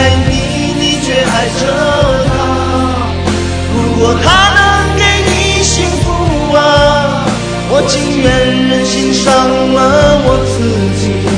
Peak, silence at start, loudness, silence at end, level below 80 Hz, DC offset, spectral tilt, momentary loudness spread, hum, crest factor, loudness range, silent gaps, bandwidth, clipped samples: 0 dBFS; 0 s; -10 LUFS; 0 s; -22 dBFS; 0.4%; -4.5 dB/octave; 6 LU; none; 10 dB; 3 LU; none; 10 kHz; 0.3%